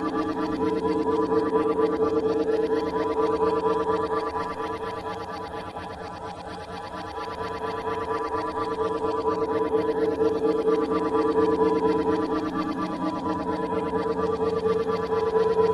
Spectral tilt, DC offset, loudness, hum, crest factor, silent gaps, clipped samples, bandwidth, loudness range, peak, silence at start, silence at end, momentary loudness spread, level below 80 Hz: -7 dB/octave; under 0.1%; -26 LUFS; none; 14 dB; none; under 0.1%; 11 kHz; 8 LU; -10 dBFS; 0 s; 0 s; 11 LU; -52 dBFS